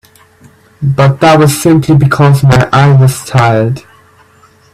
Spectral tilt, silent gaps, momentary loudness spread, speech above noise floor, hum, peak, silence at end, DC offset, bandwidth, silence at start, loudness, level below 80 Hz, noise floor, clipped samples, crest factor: -6.5 dB/octave; none; 8 LU; 37 dB; none; 0 dBFS; 0.95 s; under 0.1%; 14.5 kHz; 0.8 s; -8 LUFS; -36 dBFS; -44 dBFS; 0.1%; 8 dB